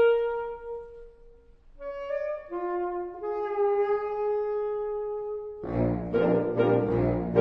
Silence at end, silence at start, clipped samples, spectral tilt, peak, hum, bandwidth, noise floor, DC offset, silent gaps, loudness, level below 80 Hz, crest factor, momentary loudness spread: 0 s; 0 s; under 0.1%; -10 dB/octave; -10 dBFS; none; 5.6 kHz; -53 dBFS; under 0.1%; none; -28 LUFS; -48 dBFS; 18 dB; 12 LU